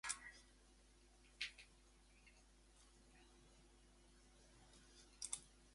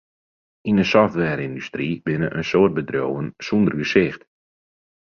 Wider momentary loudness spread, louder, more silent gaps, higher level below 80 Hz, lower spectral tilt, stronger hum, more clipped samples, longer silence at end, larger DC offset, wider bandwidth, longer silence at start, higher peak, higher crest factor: first, 20 LU vs 10 LU; second, -51 LUFS vs -21 LUFS; neither; second, -72 dBFS vs -52 dBFS; second, 0 dB/octave vs -7 dB/octave; neither; neither; second, 0 s vs 0.85 s; neither; first, 11.5 kHz vs 6.8 kHz; second, 0.05 s vs 0.65 s; second, -28 dBFS vs -2 dBFS; first, 30 dB vs 20 dB